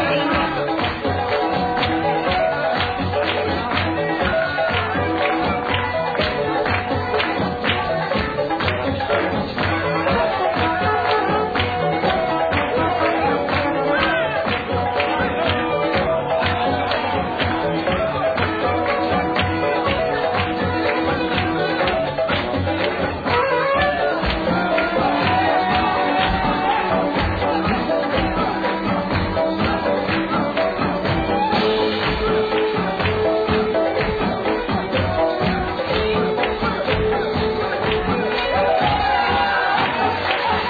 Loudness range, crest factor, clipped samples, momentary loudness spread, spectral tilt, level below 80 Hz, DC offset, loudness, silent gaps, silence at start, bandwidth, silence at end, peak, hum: 2 LU; 16 dB; under 0.1%; 3 LU; -7.5 dB/octave; -38 dBFS; under 0.1%; -19 LUFS; none; 0 s; 5 kHz; 0 s; -4 dBFS; none